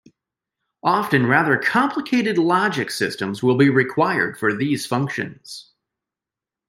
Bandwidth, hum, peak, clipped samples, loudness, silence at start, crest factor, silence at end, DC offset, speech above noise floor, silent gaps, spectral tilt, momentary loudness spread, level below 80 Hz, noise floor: 16 kHz; none; -2 dBFS; under 0.1%; -19 LUFS; 0.85 s; 18 dB; 1.1 s; under 0.1%; 69 dB; none; -5.5 dB/octave; 9 LU; -64 dBFS; -88 dBFS